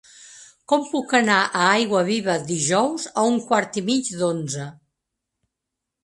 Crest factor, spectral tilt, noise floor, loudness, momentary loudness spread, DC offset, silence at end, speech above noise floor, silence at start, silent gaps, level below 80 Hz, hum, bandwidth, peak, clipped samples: 22 dB; -3.5 dB/octave; -83 dBFS; -21 LUFS; 7 LU; under 0.1%; 1.3 s; 62 dB; 0.2 s; none; -66 dBFS; none; 11.5 kHz; -2 dBFS; under 0.1%